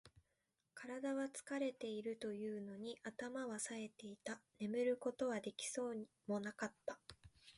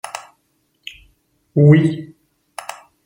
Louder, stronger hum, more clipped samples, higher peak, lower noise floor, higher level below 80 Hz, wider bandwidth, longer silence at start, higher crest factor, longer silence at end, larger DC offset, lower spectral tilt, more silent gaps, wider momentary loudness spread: second, -46 LUFS vs -14 LUFS; neither; neither; second, -30 dBFS vs -2 dBFS; first, -87 dBFS vs -65 dBFS; second, -82 dBFS vs -58 dBFS; second, 11.5 kHz vs 16 kHz; about the same, 0.05 s vs 0.05 s; about the same, 16 dB vs 18 dB; second, 0 s vs 1 s; neither; second, -4 dB/octave vs -8 dB/octave; neither; second, 10 LU vs 25 LU